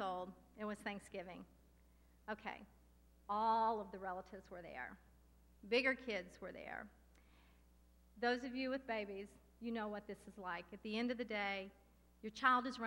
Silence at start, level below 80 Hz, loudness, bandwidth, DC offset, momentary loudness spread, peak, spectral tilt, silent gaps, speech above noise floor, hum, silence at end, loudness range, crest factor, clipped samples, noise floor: 0 s; -70 dBFS; -43 LUFS; 16 kHz; under 0.1%; 18 LU; -20 dBFS; -4.5 dB/octave; none; 26 dB; none; 0 s; 4 LU; 24 dB; under 0.1%; -69 dBFS